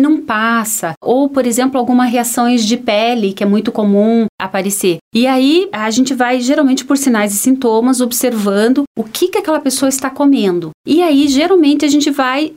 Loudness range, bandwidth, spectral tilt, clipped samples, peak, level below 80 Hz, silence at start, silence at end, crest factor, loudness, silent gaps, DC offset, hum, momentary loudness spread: 1 LU; 16.5 kHz; -4 dB/octave; under 0.1%; -2 dBFS; -56 dBFS; 0 s; 0 s; 10 dB; -13 LUFS; 0.97-1.01 s, 4.29-4.38 s, 5.01-5.11 s, 8.87-8.95 s, 10.74-10.84 s; under 0.1%; none; 5 LU